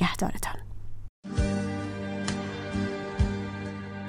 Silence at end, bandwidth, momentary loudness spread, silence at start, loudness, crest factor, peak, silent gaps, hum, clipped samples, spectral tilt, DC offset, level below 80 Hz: 0 s; 16 kHz; 15 LU; 0 s; -32 LUFS; 18 dB; -12 dBFS; 1.09-1.23 s; none; under 0.1%; -5.5 dB/octave; under 0.1%; -38 dBFS